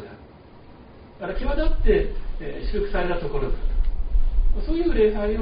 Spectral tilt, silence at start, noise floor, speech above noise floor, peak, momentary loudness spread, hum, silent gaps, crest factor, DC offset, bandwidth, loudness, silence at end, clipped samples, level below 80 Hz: -6 dB/octave; 0 s; -46 dBFS; 25 dB; -6 dBFS; 14 LU; none; none; 14 dB; under 0.1%; 5.2 kHz; -26 LUFS; 0 s; under 0.1%; -24 dBFS